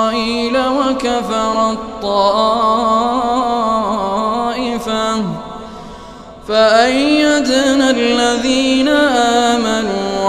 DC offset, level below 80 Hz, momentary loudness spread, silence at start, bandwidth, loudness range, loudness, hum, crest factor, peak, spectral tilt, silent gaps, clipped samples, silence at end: under 0.1%; -42 dBFS; 10 LU; 0 s; 14.5 kHz; 5 LU; -14 LUFS; none; 14 dB; 0 dBFS; -3.5 dB/octave; none; under 0.1%; 0 s